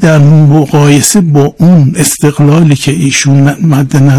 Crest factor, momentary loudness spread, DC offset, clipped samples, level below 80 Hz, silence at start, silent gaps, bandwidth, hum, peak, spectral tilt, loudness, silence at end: 6 dB; 4 LU; under 0.1%; 10%; -38 dBFS; 0 s; none; 14 kHz; none; 0 dBFS; -5.5 dB/octave; -6 LUFS; 0 s